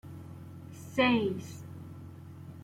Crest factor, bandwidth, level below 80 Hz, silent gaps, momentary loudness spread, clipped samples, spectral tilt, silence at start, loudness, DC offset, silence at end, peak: 20 dB; 15.5 kHz; -68 dBFS; none; 21 LU; under 0.1%; -6 dB/octave; 0.05 s; -29 LUFS; under 0.1%; 0 s; -16 dBFS